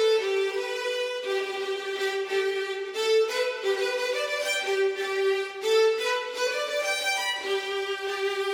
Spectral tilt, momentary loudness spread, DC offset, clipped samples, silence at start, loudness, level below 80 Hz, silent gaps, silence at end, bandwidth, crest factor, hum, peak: 0 dB/octave; 6 LU; under 0.1%; under 0.1%; 0 s; -27 LUFS; -76 dBFS; none; 0 s; 20 kHz; 14 dB; none; -12 dBFS